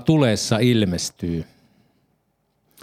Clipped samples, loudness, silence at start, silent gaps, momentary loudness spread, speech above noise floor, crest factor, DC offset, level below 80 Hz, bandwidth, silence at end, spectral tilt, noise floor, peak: under 0.1%; -20 LUFS; 0 s; none; 11 LU; 49 dB; 20 dB; under 0.1%; -52 dBFS; 15.5 kHz; 1.4 s; -5.5 dB/octave; -68 dBFS; -2 dBFS